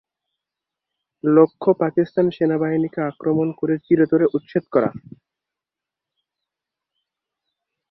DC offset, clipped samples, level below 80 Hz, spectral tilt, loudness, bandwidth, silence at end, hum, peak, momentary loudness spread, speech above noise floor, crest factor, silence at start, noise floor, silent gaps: under 0.1%; under 0.1%; -64 dBFS; -11.5 dB/octave; -20 LUFS; 5.6 kHz; 2.9 s; none; -2 dBFS; 9 LU; 68 dB; 20 dB; 1.25 s; -87 dBFS; none